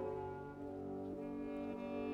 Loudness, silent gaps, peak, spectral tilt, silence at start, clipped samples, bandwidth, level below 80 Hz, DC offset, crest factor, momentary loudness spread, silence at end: -46 LUFS; none; -32 dBFS; -8.5 dB/octave; 0 s; under 0.1%; 9.4 kHz; -66 dBFS; under 0.1%; 12 dB; 4 LU; 0 s